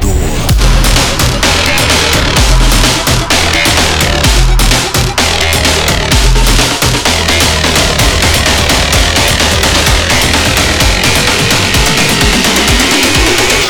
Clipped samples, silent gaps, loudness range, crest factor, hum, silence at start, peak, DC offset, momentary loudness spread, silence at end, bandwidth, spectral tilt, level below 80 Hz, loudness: under 0.1%; none; 1 LU; 8 dB; none; 0 s; 0 dBFS; under 0.1%; 2 LU; 0 s; over 20 kHz; -3 dB/octave; -14 dBFS; -8 LUFS